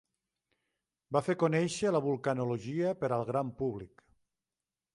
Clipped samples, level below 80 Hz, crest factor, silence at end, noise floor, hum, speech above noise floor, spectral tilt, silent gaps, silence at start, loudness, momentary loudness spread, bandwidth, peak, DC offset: under 0.1%; -68 dBFS; 20 dB; 1.1 s; under -90 dBFS; none; over 58 dB; -6.5 dB/octave; none; 1.1 s; -32 LUFS; 6 LU; 11.5 kHz; -14 dBFS; under 0.1%